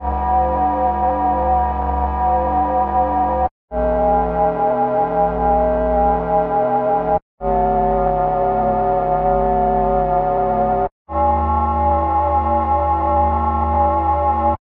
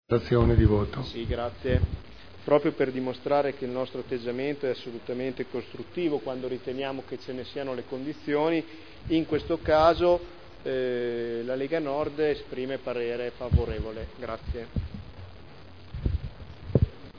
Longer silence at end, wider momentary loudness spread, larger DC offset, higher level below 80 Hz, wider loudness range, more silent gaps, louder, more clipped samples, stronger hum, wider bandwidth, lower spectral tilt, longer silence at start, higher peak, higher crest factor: first, 0.2 s vs 0 s; second, 3 LU vs 14 LU; second, under 0.1% vs 0.4%; first, -28 dBFS vs -38 dBFS; second, 1 LU vs 7 LU; first, 3.51-3.68 s, 7.22-7.38 s, 10.92-11.05 s vs none; first, -17 LUFS vs -29 LUFS; neither; neither; second, 4.5 kHz vs 5.4 kHz; first, -11 dB/octave vs -8.5 dB/octave; about the same, 0 s vs 0 s; about the same, -4 dBFS vs -6 dBFS; second, 12 dB vs 22 dB